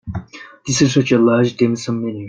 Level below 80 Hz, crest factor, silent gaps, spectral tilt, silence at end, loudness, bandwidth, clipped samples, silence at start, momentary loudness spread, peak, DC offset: -48 dBFS; 16 dB; none; -5.5 dB/octave; 0 s; -16 LUFS; 9.6 kHz; under 0.1%; 0.05 s; 16 LU; -2 dBFS; under 0.1%